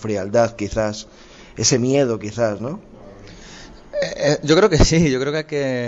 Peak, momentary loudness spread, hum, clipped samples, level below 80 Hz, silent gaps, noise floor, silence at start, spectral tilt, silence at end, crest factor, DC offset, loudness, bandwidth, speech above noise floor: -4 dBFS; 21 LU; none; under 0.1%; -32 dBFS; none; -40 dBFS; 0 s; -4.5 dB/octave; 0 s; 16 dB; under 0.1%; -18 LUFS; 8 kHz; 22 dB